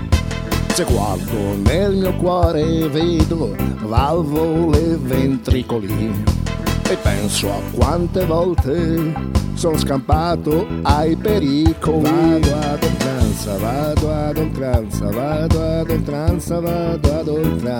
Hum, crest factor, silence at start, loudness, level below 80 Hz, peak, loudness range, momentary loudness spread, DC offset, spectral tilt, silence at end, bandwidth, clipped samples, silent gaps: none; 16 dB; 0 s; -18 LUFS; -26 dBFS; 0 dBFS; 3 LU; 5 LU; under 0.1%; -6.5 dB/octave; 0 s; over 20 kHz; under 0.1%; none